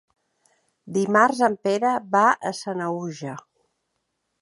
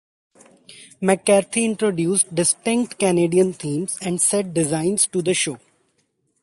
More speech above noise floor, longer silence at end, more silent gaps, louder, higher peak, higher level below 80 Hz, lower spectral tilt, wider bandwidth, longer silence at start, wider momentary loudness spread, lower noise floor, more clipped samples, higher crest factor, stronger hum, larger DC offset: first, 54 dB vs 48 dB; first, 1.05 s vs 0.85 s; neither; about the same, -22 LUFS vs -20 LUFS; about the same, -2 dBFS vs -2 dBFS; second, -74 dBFS vs -62 dBFS; about the same, -5 dB/octave vs -4 dB/octave; about the same, 11.5 kHz vs 12 kHz; first, 0.85 s vs 0.7 s; first, 15 LU vs 7 LU; first, -76 dBFS vs -68 dBFS; neither; about the same, 22 dB vs 18 dB; neither; neither